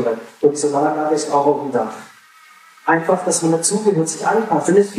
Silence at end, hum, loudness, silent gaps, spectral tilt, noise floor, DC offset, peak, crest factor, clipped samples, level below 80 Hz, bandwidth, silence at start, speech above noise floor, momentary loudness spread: 0 s; none; -17 LUFS; none; -4.5 dB/octave; -46 dBFS; under 0.1%; -2 dBFS; 16 dB; under 0.1%; -74 dBFS; 14 kHz; 0 s; 29 dB; 7 LU